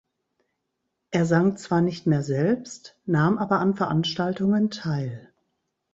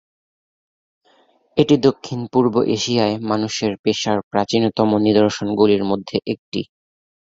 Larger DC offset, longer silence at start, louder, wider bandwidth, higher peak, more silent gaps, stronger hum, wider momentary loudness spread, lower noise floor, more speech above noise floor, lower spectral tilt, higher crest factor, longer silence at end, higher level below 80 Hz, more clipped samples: neither; second, 1.1 s vs 1.55 s; second, -24 LUFS vs -19 LUFS; about the same, 8 kHz vs 7.8 kHz; second, -6 dBFS vs -2 dBFS; second, none vs 3.79-3.84 s, 4.23-4.31 s, 6.39-6.52 s; neither; about the same, 8 LU vs 10 LU; first, -79 dBFS vs -57 dBFS; first, 56 dB vs 40 dB; first, -7 dB/octave vs -5.5 dB/octave; about the same, 18 dB vs 18 dB; about the same, 0.75 s vs 0.75 s; second, -62 dBFS vs -54 dBFS; neither